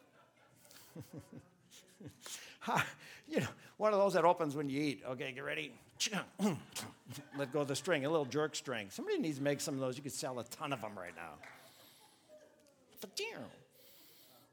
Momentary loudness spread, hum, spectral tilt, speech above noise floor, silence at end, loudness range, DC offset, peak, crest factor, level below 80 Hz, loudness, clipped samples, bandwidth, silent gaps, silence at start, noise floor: 21 LU; none; -4 dB/octave; 29 dB; 0.3 s; 11 LU; under 0.1%; -16 dBFS; 24 dB; -80 dBFS; -38 LUFS; under 0.1%; over 20 kHz; none; 0.7 s; -67 dBFS